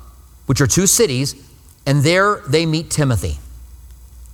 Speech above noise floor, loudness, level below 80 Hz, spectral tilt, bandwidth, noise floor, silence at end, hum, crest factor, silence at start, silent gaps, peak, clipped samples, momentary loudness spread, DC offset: 23 dB; -16 LUFS; -36 dBFS; -4 dB/octave; 17 kHz; -39 dBFS; 0 s; none; 18 dB; 0 s; none; 0 dBFS; under 0.1%; 14 LU; under 0.1%